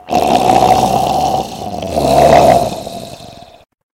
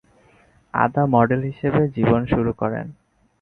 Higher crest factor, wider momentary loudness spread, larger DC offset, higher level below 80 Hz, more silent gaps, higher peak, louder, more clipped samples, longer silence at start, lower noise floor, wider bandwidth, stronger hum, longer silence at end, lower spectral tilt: second, 12 dB vs 20 dB; first, 17 LU vs 9 LU; neither; first, -34 dBFS vs -44 dBFS; neither; about the same, 0 dBFS vs -2 dBFS; first, -11 LUFS vs -20 LUFS; first, 0.4% vs under 0.1%; second, 0.05 s vs 0.75 s; second, -35 dBFS vs -55 dBFS; first, 16.5 kHz vs 4.2 kHz; neither; about the same, 0.6 s vs 0.5 s; second, -5 dB/octave vs -10.5 dB/octave